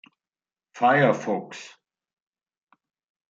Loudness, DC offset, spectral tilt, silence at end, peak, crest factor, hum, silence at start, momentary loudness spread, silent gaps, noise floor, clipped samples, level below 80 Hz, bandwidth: -22 LUFS; under 0.1%; -6 dB/octave; 1.65 s; -8 dBFS; 20 dB; none; 0.75 s; 21 LU; none; under -90 dBFS; under 0.1%; -76 dBFS; 7.8 kHz